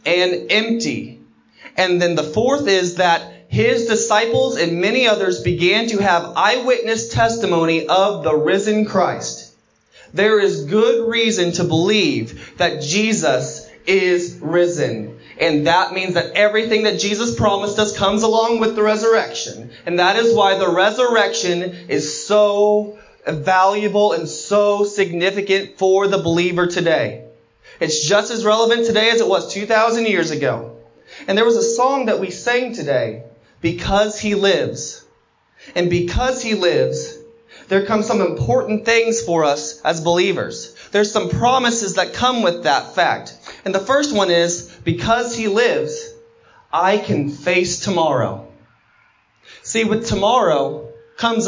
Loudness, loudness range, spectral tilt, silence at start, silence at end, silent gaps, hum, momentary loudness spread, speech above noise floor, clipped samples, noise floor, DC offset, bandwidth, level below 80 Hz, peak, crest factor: -17 LUFS; 3 LU; -4 dB/octave; 0.05 s; 0 s; none; none; 9 LU; 41 dB; under 0.1%; -58 dBFS; under 0.1%; 7.6 kHz; -44 dBFS; -2 dBFS; 16 dB